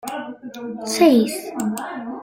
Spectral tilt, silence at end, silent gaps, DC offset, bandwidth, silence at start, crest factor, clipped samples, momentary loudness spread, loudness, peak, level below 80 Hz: -4 dB/octave; 0 s; none; under 0.1%; 16.5 kHz; 0.05 s; 18 dB; under 0.1%; 18 LU; -20 LUFS; -2 dBFS; -64 dBFS